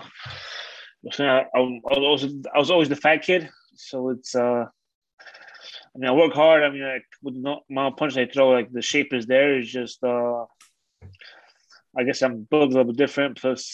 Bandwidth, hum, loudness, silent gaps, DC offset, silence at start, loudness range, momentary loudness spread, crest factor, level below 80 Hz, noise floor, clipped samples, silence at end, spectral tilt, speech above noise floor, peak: 8.6 kHz; none; -22 LUFS; 4.95-5.02 s, 5.13-5.18 s; under 0.1%; 0 s; 4 LU; 17 LU; 20 dB; -66 dBFS; -58 dBFS; under 0.1%; 0 s; -4.5 dB/octave; 36 dB; -4 dBFS